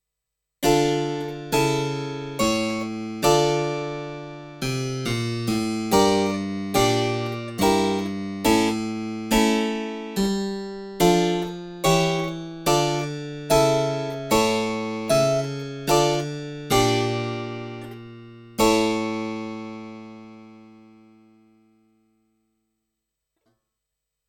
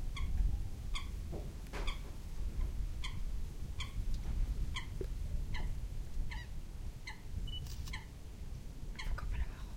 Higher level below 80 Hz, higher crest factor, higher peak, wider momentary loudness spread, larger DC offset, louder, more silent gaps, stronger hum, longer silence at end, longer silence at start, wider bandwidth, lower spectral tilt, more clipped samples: second, -46 dBFS vs -40 dBFS; about the same, 20 dB vs 16 dB; first, -4 dBFS vs -22 dBFS; first, 14 LU vs 8 LU; neither; first, -23 LUFS vs -44 LUFS; neither; neither; first, 3.55 s vs 0 s; first, 0.6 s vs 0 s; first, over 20 kHz vs 16 kHz; about the same, -4.5 dB/octave vs -5 dB/octave; neither